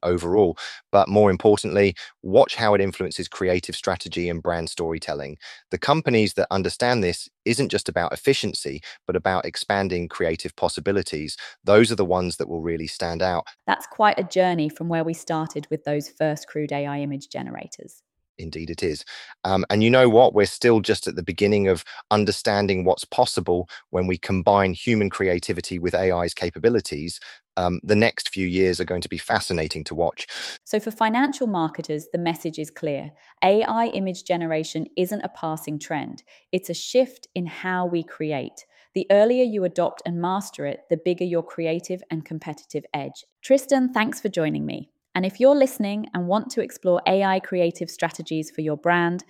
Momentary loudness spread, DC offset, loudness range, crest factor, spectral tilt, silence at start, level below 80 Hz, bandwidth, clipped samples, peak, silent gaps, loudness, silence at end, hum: 13 LU; under 0.1%; 7 LU; 20 dB; -5.5 dB/octave; 0.05 s; -52 dBFS; 15.5 kHz; under 0.1%; -2 dBFS; 18.29-18.35 s, 43.32-43.36 s; -23 LUFS; 0.05 s; none